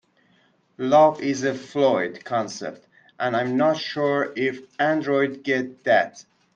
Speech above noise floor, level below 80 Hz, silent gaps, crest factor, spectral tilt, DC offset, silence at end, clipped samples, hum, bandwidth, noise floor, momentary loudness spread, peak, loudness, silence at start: 40 dB; -70 dBFS; none; 18 dB; -5 dB/octave; under 0.1%; 0.35 s; under 0.1%; none; 8.6 kHz; -62 dBFS; 10 LU; -4 dBFS; -22 LUFS; 0.8 s